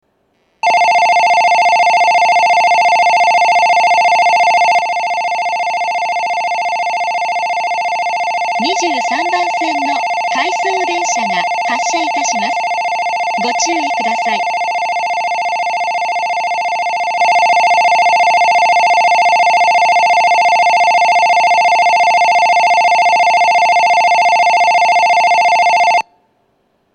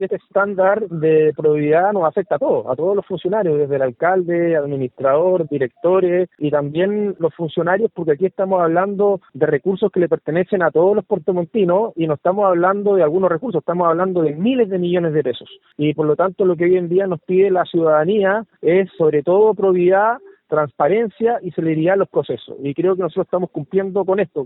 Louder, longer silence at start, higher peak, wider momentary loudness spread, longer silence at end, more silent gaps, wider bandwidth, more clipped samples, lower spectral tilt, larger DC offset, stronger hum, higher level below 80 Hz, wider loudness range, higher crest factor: first, -12 LUFS vs -17 LUFS; first, 0.65 s vs 0 s; about the same, -2 dBFS vs -2 dBFS; about the same, 6 LU vs 6 LU; first, 0.95 s vs 0 s; neither; first, 10.5 kHz vs 4.1 kHz; neither; second, -1 dB/octave vs -12.5 dB/octave; neither; neither; second, -72 dBFS vs -62 dBFS; first, 6 LU vs 2 LU; second, 10 dB vs 16 dB